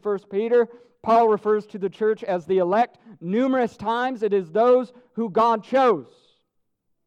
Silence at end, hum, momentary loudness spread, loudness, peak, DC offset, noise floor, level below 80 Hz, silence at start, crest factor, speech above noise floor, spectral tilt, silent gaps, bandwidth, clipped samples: 1.05 s; none; 9 LU; -22 LUFS; -8 dBFS; under 0.1%; -73 dBFS; -68 dBFS; 0.05 s; 14 dB; 51 dB; -7 dB/octave; none; 8.4 kHz; under 0.1%